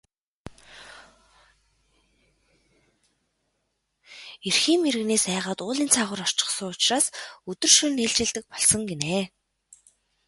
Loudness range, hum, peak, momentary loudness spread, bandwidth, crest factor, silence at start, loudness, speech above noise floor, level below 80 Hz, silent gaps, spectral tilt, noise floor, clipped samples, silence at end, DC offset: 6 LU; none; -4 dBFS; 20 LU; 12 kHz; 24 dB; 0.45 s; -22 LUFS; 52 dB; -60 dBFS; none; -1.5 dB/octave; -76 dBFS; under 0.1%; 1 s; under 0.1%